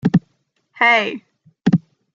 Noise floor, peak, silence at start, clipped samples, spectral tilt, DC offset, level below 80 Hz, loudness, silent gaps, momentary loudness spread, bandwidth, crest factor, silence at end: -66 dBFS; -2 dBFS; 0.05 s; under 0.1%; -7 dB/octave; under 0.1%; -58 dBFS; -17 LUFS; none; 11 LU; 7.4 kHz; 16 dB; 0.35 s